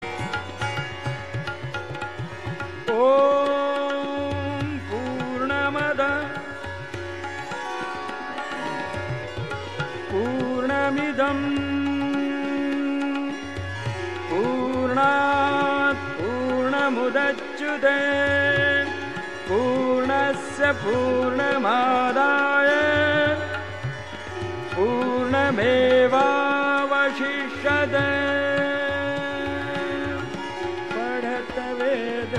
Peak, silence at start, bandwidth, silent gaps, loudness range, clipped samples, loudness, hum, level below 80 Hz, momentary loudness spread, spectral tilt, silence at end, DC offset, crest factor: -8 dBFS; 0 s; 11.5 kHz; none; 6 LU; under 0.1%; -23 LUFS; none; -54 dBFS; 12 LU; -5.5 dB/octave; 0 s; 0.5%; 16 dB